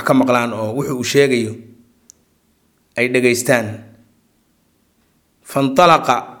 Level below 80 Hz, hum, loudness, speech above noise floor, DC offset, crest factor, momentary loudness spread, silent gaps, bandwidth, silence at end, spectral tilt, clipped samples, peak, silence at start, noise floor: -58 dBFS; none; -16 LUFS; 45 dB; under 0.1%; 18 dB; 16 LU; none; 17.5 kHz; 0.05 s; -4.5 dB/octave; under 0.1%; 0 dBFS; 0 s; -60 dBFS